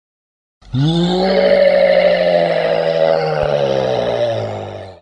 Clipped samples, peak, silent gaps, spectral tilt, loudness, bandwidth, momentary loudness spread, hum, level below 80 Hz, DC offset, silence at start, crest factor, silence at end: under 0.1%; -2 dBFS; none; -7 dB/octave; -14 LUFS; 9 kHz; 10 LU; none; -44 dBFS; under 0.1%; 0.7 s; 14 dB; 0.05 s